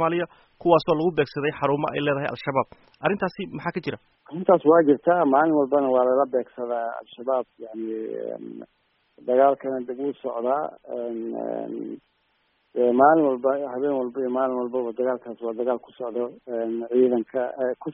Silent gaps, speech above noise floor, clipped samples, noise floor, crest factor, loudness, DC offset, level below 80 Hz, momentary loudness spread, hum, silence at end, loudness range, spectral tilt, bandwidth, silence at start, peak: none; 45 dB; under 0.1%; -69 dBFS; 20 dB; -24 LUFS; under 0.1%; -66 dBFS; 14 LU; none; 0 s; 6 LU; -5.5 dB/octave; 5.6 kHz; 0 s; -4 dBFS